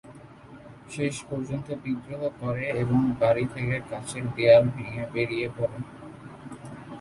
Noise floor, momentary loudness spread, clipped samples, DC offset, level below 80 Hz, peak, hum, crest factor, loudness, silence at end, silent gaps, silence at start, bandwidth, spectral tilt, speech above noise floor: -47 dBFS; 23 LU; under 0.1%; under 0.1%; -56 dBFS; -4 dBFS; none; 22 dB; -26 LUFS; 0 s; none; 0.05 s; 11.5 kHz; -6.5 dB/octave; 21 dB